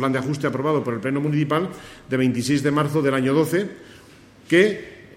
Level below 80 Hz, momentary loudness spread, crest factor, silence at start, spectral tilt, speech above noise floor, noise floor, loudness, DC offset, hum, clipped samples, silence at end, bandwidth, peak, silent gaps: -58 dBFS; 9 LU; 20 dB; 0 s; -6 dB/octave; 27 dB; -48 dBFS; -21 LUFS; under 0.1%; none; under 0.1%; 0 s; 16 kHz; -2 dBFS; none